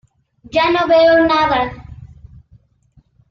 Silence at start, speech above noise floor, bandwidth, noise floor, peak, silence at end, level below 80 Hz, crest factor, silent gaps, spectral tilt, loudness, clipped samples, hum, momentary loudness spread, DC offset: 0.55 s; 41 dB; 7 kHz; -54 dBFS; -2 dBFS; 1.25 s; -44 dBFS; 14 dB; none; -6 dB/octave; -14 LUFS; under 0.1%; none; 12 LU; under 0.1%